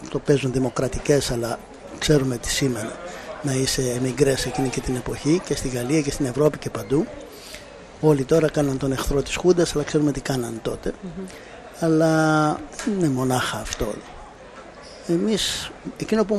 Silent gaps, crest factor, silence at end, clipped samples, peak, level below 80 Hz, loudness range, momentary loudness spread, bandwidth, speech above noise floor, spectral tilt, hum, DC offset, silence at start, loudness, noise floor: none; 18 dB; 0 s; under 0.1%; -4 dBFS; -40 dBFS; 2 LU; 18 LU; 13.5 kHz; 20 dB; -5 dB/octave; none; under 0.1%; 0 s; -23 LUFS; -42 dBFS